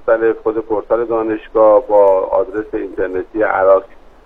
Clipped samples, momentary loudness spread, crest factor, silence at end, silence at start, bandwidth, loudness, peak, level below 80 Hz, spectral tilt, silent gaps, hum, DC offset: under 0.1%; 10 LU; 14 dB; 0.3 s; 0 s; 3.8 kHz; -15 LUFS; 0 dBFS; -42 dBFS; -8.5 dB/octave; none; none; under 0.1%